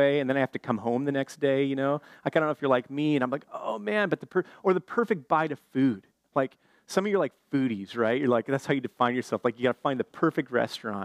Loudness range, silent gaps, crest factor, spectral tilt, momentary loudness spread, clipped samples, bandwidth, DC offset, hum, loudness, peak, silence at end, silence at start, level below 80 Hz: 1 LU; none; 18 dB; -6.5 dB/octave; 5 LU; under 0.1%; 13.5 kHz; under 0.1%; none; -28 LUFS; -10 dBFS; 0 s; 0 s; -78 dBFS